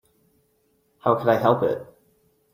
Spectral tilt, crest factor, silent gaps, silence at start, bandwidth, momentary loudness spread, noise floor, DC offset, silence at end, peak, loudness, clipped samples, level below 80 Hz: -8 dB/octave; 22 dB; none; 1.05 s; 16 kHz; 8 LU; -67 dBFS; under 0.1%; 0.7 s; -4 dBFS; -22 LUFS; under 0.1%; -66 dBFS